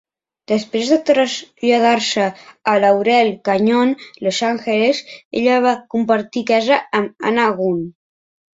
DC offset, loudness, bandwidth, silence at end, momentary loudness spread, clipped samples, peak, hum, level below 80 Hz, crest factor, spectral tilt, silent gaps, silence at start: under 0.1%; -17 LUFS; 7.8 kHz; 0.65 s; 7 LU; under 0.1%; -2 dBFS; none; -62 dBFS; 16 dB; -4.5 dB/octave; 5.25-5.31 s; 0.5 s